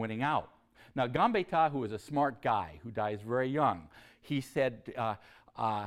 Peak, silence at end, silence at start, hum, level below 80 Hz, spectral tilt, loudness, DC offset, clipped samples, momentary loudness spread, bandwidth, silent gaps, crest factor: -14 dBFS; 0 s; 0 s; none; -64 dBFS; -6.5 dB/octave; -33 LUFS; under 0.1%; under 0.1%; 9 LU; 14.5 kHz; none; 18 dB